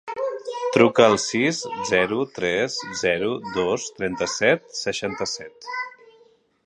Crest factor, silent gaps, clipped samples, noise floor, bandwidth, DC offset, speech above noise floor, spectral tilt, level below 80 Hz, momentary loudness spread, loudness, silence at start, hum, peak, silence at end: 22 dB; none; under 0.1%; -57 dBFS; 10.5 kHz; under 0.1%; 35 dB; -3.5 dB/octave; -58 dBFS; 12 LU; -22 LUFS; 0.05 s; none; 0 dBFS; 0.75 s